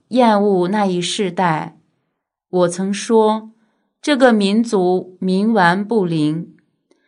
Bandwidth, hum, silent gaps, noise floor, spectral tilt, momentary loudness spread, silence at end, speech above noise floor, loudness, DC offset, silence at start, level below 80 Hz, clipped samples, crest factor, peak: 10.5 kHz; none; none; -74 dBFS; -5.5 dB/octave; 10 LU; 0.6 s; 59 dB; -16 LUFS; under 0.1%; 0.1 s; -68 dBFS; under 0.1%; 16 dB; 0 dBFS